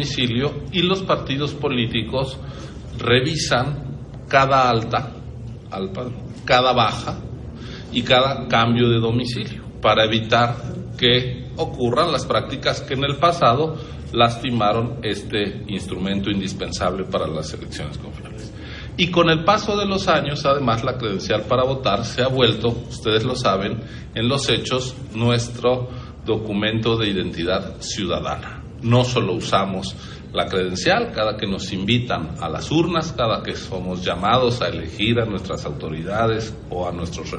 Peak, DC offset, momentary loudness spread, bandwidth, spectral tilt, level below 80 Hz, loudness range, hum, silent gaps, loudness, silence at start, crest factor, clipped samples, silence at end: -2 dBFS; under 0.1%; 13 LU; 11 kHz; -5 dB/octave; -42 dBFS; 3 LU; none; none; -20 LUFS; 0 s; 18 dB; under 0.1%; 0 s